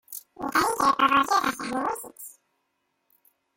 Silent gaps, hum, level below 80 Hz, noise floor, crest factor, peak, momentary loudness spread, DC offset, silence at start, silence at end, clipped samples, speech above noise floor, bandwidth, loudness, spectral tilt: none; none; -62 dBFS; -76 dBFS; 20 dB; -8 dBFS; 20 LU; under 0.1%; 0.1 s; 1.25 s; under 0.1%; 53 dB; 17 kHz; -24 LUFS; -2.5 dB/octave